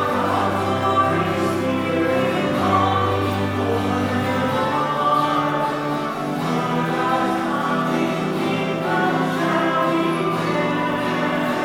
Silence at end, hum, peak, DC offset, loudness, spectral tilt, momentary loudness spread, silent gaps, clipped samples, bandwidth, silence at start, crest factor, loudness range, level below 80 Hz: 0 s; none; -6 dBFS; under 0.1%; -20 LUFS; -6 dB/octave; 4 LU; none; under 0.1%; 18.5 kHz; 0 s; 16 dB; 1 LU; -54 dBFS